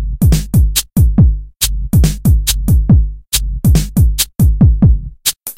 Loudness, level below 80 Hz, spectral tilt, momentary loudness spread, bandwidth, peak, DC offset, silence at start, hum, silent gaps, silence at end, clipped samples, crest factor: -13 LUFS; -14 dBFS; -5 dB/octave; 6 LU; 17 kHz; 0 dBFS; under 0.1%; 0 s; none; none; 0.05 s; under 0.1%; 12 dB